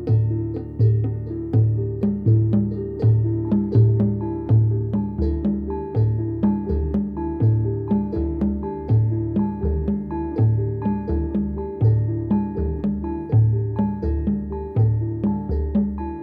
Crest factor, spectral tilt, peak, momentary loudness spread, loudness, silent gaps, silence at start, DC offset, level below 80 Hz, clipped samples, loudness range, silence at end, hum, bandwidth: 14 dB; -13 dB/octave; -6 dBFS; 7 LU; -22 LUFS; none; 0 s; under 0.1%; -32 dBFS; under 0.1%; 3 LU; 0 s; none; 2.6 kHz